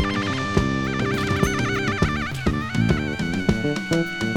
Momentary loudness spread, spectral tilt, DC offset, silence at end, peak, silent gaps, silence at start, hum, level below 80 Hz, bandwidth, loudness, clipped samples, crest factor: 3 LU; -5.5 dB/octave; under 0.1%; 0 s; -2 dBFS; none; 0 s; none; -36 dBFS; 18.5 kHz; -23 LUFS; under 0.1%; 20 dB